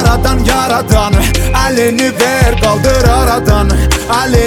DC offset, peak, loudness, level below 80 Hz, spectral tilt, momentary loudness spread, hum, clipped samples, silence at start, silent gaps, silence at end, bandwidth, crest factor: under 0.1%; 0 dBFS; -10 LUFS; -14 dBFS; -5 dB/octave; 2 LU; none; under 0.1%; 0 s; none; 0 s; 18 kHz; 10 dB